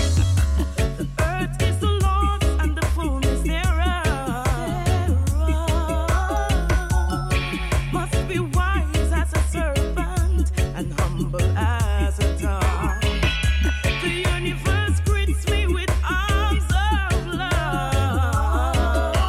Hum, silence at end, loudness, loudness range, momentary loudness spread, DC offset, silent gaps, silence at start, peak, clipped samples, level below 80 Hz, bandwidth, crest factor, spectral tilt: none; 0 s; -22 LUFS; 1 LU; 3 LU; under 0.1%; none; 0 s; -8 dBFS; under 0.1%; -22 dBFS; 14.5 kHz; 12 dB; -5.5 dB/octave